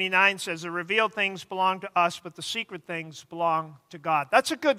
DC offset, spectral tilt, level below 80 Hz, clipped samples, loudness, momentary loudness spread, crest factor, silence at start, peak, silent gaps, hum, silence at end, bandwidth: under 0.1%; -3 dB/octave; -78 dBFS; under 0.1%; -26 LUFS; 13 LU; 22 dB; 0 s; -4 dBFS; none; none; 0 s; 16 kHz